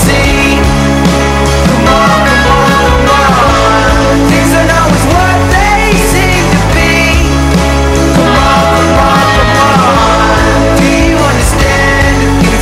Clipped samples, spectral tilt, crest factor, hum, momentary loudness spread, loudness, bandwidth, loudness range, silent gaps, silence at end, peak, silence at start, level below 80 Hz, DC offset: under 0.1%; -5 dB/octave; 6 dB; none; 2 LU; -7 LUFS; 16.5 kHz; 1 LU; none; 0 s; 0 dBFS; 0 s; -14 dBFS; under 0.1%